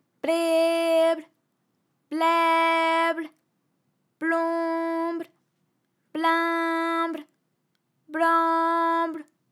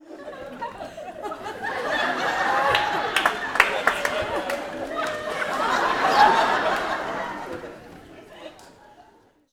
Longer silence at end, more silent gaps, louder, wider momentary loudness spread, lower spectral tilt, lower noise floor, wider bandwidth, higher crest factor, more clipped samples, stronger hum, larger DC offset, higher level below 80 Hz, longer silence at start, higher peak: second, 0.3 s vs 0.5 s; neither; about the same, -24 LUFS vs -23 LUFS; second, 14 LU vs 18 LU; about the same, -2 dB/octave vs -2.5 dB/octave; first, -74 dBFS vs -56 dBFS; second, 16 kHz vs over 20 kHz; second, 16 dB vs 26 dB; neither; neither; neither; second, under -90 dBFS vs -54 dBFS; first, 0.25 s vs 0.05 s; second, -10 dBFS vs 0 dBFS